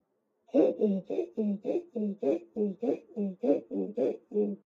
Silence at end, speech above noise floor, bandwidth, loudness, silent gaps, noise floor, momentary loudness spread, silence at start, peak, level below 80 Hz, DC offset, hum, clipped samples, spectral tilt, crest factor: 0.1 s; 39 dB; 7 kHz; -31 LUFS; none; -69 dBFS; 7 LU; 0.55 s; -14 dBFS; -84 dBFS; under 0.1%; none; under 0.1%; -10 dB/octave; 18 dB